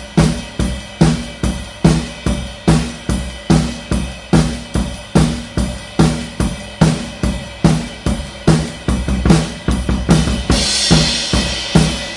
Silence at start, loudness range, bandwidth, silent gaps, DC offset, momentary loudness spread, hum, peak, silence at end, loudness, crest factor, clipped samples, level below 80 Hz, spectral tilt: 0 s; 3 LU; 11.5 kHz; none; under 0.1%; 8 LU; none; 0 dBFS; 0 s; -16 LUFS; 16 dB; under 0.1%; -24 dBFS; -5 dB/octave